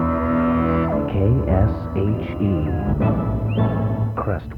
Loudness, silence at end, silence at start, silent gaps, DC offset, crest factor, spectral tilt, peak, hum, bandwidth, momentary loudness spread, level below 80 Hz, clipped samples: -20 LUFS; 0 s; 0 s; none; under 0.1%; 14 dB; -10.5 dB/octave; -4 dBFS; none; 4.2 kHz; 4 LU; -30 dBFS; under 0.1%